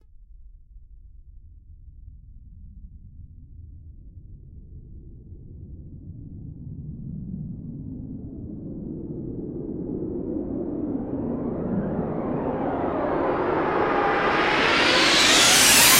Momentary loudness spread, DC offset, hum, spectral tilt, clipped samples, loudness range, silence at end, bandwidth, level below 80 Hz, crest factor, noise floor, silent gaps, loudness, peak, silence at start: 25 LU; under 0.1%; none; -2 dB/octave; under 0.1%; 26 LU; 0 s; 16 kHz; -44 dBFS; 22 dB; -46 dBFS; none; -21 LUFS; -4 dBFS; 0.2 s